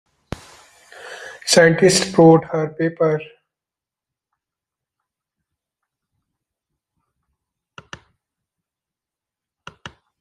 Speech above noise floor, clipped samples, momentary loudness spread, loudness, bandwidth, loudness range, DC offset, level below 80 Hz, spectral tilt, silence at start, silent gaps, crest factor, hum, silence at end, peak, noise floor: 74 dB; under 0.1%; 24 LU; -15 LUFS; 15 kHz; 11 LU; under 0.1%; -56 dBFS; -4.5 dB/octave; 1.05 s; none; 20 dB; none; 0.3 s; -2 dBFS; -88 dBFS